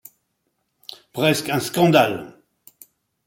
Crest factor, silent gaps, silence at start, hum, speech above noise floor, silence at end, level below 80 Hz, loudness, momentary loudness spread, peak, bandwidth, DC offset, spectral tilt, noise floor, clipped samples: 20 dB; none; 1.15 s; none; 54 dB; 0.95 s; -62 dBFS; -19 LUFS; 24 LU; -2 dBFS; 17 kHz; under 0.1%; -5 dB/octave; -73 dBFS; under 0.1%